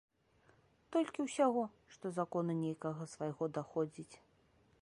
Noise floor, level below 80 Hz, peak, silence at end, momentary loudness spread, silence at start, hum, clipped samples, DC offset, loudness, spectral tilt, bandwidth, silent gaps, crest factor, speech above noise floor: -71 dBFS; -80 dBFS; -20 dBFS; 0.65 s; 11 LU; 0.9 s; none; under 0.1%; under 0.1%; -39 LUFS; -6.5 dB/octave; 11.5 kHz; none; 20 dB; 33 dB